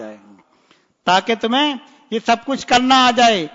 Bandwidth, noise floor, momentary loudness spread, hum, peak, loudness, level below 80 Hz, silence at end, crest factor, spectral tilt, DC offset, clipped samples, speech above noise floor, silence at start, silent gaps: 7.8 kHz; -57 dBFS; 14 LU; none; -2 dBFS; -16 LUFS; -54 dBFS; 0.05 s; 16 dB; -3 dB/octave; under 0.1%; under 0.1%; 41 dB; 0 s; none